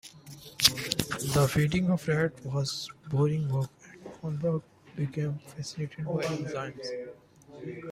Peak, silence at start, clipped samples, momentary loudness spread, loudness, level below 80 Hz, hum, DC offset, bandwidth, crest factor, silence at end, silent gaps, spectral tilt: -4 dBFS; 0.05 s; under 0.1%; 19 LU; -30 LUFS; -56 dBFS; none; under 0.1%; 16 kHz; 28 dB; 0 s; none; -4.5 dB/octave